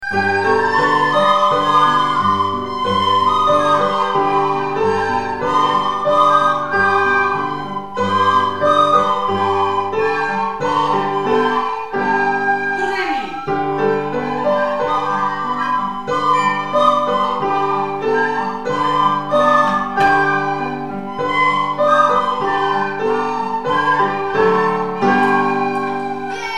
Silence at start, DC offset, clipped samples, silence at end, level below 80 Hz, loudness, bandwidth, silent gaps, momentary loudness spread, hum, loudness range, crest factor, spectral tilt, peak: 0 s; 1%; under 0.1%; 0 s; -50 dBFS; -16 LUFS; 12 kHz; none; 7 LU; none; 3 LU; 16 dB; -5 dB/octave; 0 dBFS